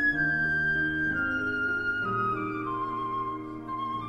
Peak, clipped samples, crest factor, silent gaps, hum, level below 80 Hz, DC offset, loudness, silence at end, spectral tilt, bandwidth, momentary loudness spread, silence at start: -16 dBFS; under 0.1%; 12 dB; none; none; -52 dBFS; under 0.1%; -28 LUFS; 0 s; -7 dB/octave; 11.5 kHz; 8 LU; 0 s